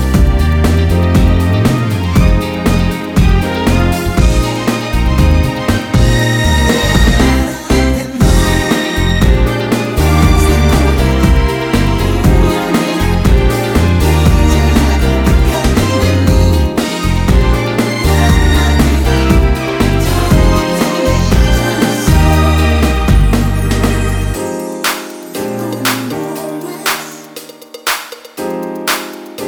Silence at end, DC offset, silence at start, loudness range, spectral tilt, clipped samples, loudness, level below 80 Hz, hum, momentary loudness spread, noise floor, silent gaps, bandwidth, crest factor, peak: 0 s; 0.1%; 0 s; 6 LU; -5.5 dB/octave; under 0.1%; -12 LUFS; -14 dBFS; none; 8 LU; -31 dBFS; none; 18 kHz; 10 dB; 0 dBFS